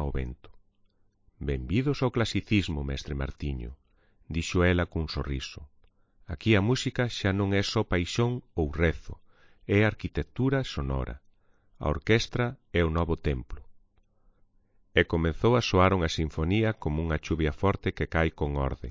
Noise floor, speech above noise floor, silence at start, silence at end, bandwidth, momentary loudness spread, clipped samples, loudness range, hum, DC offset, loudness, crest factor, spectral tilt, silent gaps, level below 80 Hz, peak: -66 dBFS; 38 dB; 0 s; 0 s; 7.6 kHz; 11 LU; under 0.1%; 4 LU; none; under 0.1%; -28 LUFS; 22 dB; -6 dB/octave; none; -38 dBFS; -8 dBFS